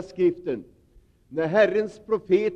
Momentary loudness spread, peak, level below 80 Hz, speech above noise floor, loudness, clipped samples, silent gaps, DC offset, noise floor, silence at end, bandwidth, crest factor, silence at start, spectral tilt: 13 LU; -6 dBFS; -60 dBFS; 34 dB; -24 LUFS; under 0.1%; none; under 0.1%; -57 dBFS; 0 s; 8 kHz; 18 dB; 0 s; -7 dB/octave